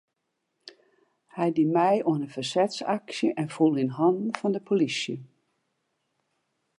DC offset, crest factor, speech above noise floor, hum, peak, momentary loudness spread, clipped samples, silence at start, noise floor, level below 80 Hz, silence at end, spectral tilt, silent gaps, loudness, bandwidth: under 0.1%; 20 dB; 54 dB; none; -8 dBFS; 7 LU; under 0.1%; 0.65 s; -80 dBFS; -80 dBFS; 1.55 s; -6 dB/octave; none; -26 LUFS; 11 kHz